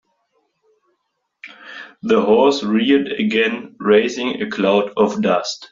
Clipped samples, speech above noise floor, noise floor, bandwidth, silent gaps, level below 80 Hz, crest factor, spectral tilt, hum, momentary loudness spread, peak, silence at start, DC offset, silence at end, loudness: under 0.1%; 56 dB; -72 dBFS; 7.6 kHz; none; -60 dBFS; 18 dB; -3.5 dB/octave; none; 15 LU; -2 dBFS; 1.45 s; under 0.1%; 0.05 s; -17 LUFS